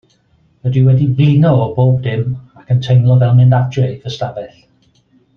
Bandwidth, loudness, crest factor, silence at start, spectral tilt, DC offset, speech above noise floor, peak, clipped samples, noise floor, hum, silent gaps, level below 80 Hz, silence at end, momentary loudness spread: 6.4 kHz; -13 LUFS; 12 dB; 0.65 s; -9 dB/octave; under 0.1%; 43 dB; -2 dBFS; under 0.1%; -54 dBFS; none; none; -48 dBFS; 0.9 s; 13 LU